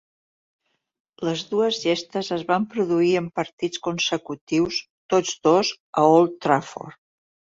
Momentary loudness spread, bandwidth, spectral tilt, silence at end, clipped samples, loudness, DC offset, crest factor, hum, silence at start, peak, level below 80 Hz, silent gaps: 11 LU; 7.8 kHz; -4.5 dB/octave; 0.65 s; under 0.1%; -22 LUFS; under 0.1%; 20 dB; none; 1.2 s; -4 dBFS; -64 dBFS; 3.53-3.58 s, 4.41-4.47 s, 4.90-5.09 s, 5.80-5.93 s